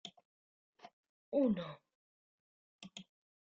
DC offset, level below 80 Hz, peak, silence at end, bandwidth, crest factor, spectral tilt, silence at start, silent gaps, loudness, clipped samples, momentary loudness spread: under 0.1%; -78 dBFS; -22 dBFS; 0.4 s; 7.4 kHz; 20 dB; -6 dB/octave; 0.05 s; 0.25-0.73 s, 0.93-1.32 s, 1.95-2.79 s; -37 LUFS; under 0.1%; 23 LU